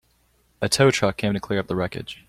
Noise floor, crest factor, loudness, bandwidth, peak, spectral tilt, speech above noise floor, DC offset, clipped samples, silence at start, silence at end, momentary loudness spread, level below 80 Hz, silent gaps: -63 dBFS; 18 dB; -22 LUFS; 15 kHz; -6 dBFS; -4.5 dB/octave; 41 dB; under 0.1%; under 0.1%; 0.6 s; 0.15 s; 10 LU; -52 dBFS; none